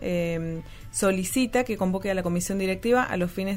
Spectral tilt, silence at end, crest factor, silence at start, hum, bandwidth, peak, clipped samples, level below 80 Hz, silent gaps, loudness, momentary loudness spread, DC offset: -5 dB/octave; 0 s; 16 dB; 0 s; none; 16 kHz; -10 dBFS; under 0.1%; -46 dBFS; none; -26 LUFS; 8 LU; under 0.1%